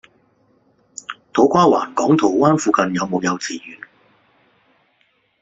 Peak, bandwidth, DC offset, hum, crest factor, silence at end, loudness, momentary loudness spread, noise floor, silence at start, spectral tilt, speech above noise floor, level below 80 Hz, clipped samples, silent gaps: 0 dBFS; 8 kHz; under 0.1%; none; 18 dB; 1.65 s; -17 LUFS; 20 LU; -62 dBFS; 1.1 s; -5.5 dB/octave; 46 dB; -60 dBFS; under 0.1%; none